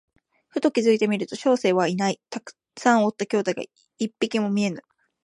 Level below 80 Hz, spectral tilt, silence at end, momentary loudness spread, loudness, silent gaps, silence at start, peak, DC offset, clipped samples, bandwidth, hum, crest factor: -74 dBFS; -5 dB/octave; 0.45 s; 15 LU; -23 LUFS; none; 0.55 s; -4 dBFS; under 0.1%; under 0.1%; 11 kHz; none; 20 dB